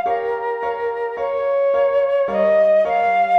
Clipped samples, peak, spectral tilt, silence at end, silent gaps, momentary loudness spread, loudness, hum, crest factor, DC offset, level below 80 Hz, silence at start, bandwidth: under 0.1%; -8 dBFS; -6 dB/octave; 0 s; none; 8 LU; -18 LUFS; none; 10 dB; under 0.1%; -58 dBFS; 0 s; 6.2 kHz